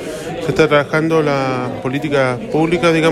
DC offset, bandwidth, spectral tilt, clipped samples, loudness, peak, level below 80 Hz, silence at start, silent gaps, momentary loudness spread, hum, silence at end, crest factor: under 0.1%; 13.5 kHz; -6 dB/octave; under 0.1%; -16 LUFS; 0 dBFS; -44 dBFS; 0 s; none; 8 LU; none; 0 s; 14 dB